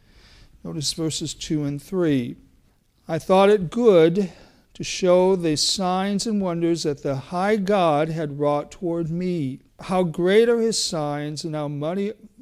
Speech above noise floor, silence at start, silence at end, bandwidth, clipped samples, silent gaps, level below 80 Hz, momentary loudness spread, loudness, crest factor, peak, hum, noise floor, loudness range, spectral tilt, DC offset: 39 dB; 0.65 s; 0.15 s; 15.5 kHz; under 0.1%; none; -52 dBFS; 11 LU; -22 LUFS; 18 dB; -4 dBFS; none; -60 dBFS; 4 LU; -5 dB/octave; under 0.1%